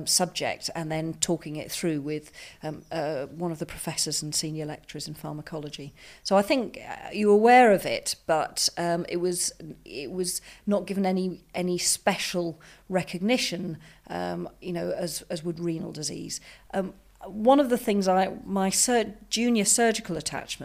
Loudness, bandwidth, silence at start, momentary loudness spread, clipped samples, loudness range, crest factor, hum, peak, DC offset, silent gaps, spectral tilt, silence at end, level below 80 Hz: -26 LUFS; 15.5 kHz; 0 s; 16 LU; under 0.1%; 8 LU; 20 dB; none; -6 dBFS; under 0.1%; none; -3.5 dB/octave; 0 s; -58 dBFS